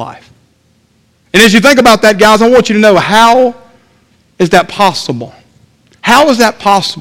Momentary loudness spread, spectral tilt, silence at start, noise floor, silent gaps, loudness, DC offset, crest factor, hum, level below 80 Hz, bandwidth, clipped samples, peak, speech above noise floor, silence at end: 13 LU; -4 dB/octave; 0 s; -52 dBFS; none; -7 LUFS; under 0.1%; 8 dB; none; -40 dBFS; 18.5 kHz; 3%; 0 dBFS; 45 dB; 0 s